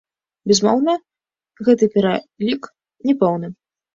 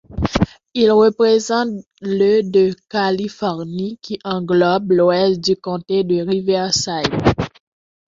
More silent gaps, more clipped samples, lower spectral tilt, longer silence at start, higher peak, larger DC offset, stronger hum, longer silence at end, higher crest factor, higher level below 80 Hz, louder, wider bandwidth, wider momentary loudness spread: second, none vs 1.87-1.91 s; neither; about the same, -5 dB/octave vs -5 dB/octave; first, 0.45 s vs 0.1 s; about the same, -2 dBFS vs -2 dBFS; neither; neither; second, 0.4 s vs 0.7 s; about the same, 18 dB vs 16 dB; second, -62 dBFS vs -40 dBFS; about the same, -18 LUFS vs -17 LUFS; about the same, 7.6 kHz vs 7.8 kHz; about the same, 11 LU vs 11 LU